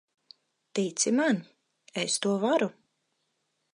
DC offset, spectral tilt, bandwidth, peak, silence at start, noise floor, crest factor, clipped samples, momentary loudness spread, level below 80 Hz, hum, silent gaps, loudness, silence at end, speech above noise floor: under 0.1%; -3.5 dB/octave; 11.5 kHz; -12 dBFS; 0.75 s; -78 dBFS; 20 dB; under 0.1%; 9 LU; -84 dBFS; none; none; -28 LUFS; 1 s; 51 dB